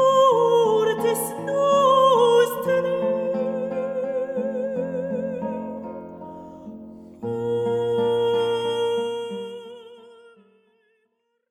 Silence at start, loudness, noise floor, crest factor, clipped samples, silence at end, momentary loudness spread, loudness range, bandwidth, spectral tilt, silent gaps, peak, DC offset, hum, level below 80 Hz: 0 s; -22 LUFS; -72 dBFS; 16 dB; under 0.1%; 1.55 s; 22 LU; 10 LU; 16 kHz; -4.5 dB/octave; none; -6 dBFS; under 0.1%; none; -66 dBFS